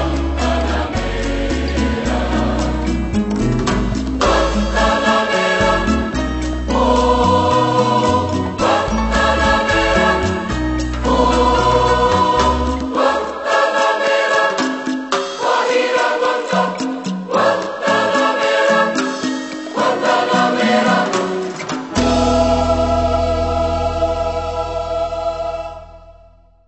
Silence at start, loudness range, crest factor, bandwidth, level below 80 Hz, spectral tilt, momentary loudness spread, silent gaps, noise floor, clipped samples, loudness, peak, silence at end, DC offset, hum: 0 s; 4 LU; 14 dB; 8.4 kHz; -26 dBFS; -5 dB/octave; 7 LU; none; -47 dBFS; under 0.1%; -16 LUFS; -2 dBFS; 0.55 s; under 0.1%; none